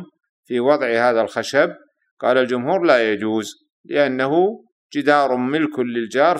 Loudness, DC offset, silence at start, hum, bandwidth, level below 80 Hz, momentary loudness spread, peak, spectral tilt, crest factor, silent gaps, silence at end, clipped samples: -19 LUFS; under 0.1%; 0 s; none; 13.5 kHz; -70 dBFS; 8 LU; 0 dBFS; -5 dB/octave; 18 dB; 0.29-0.43 s, 2.11-2.17 s, 3.72-3.84 s, 4.72-4.89 s; 0 s; under 0.1%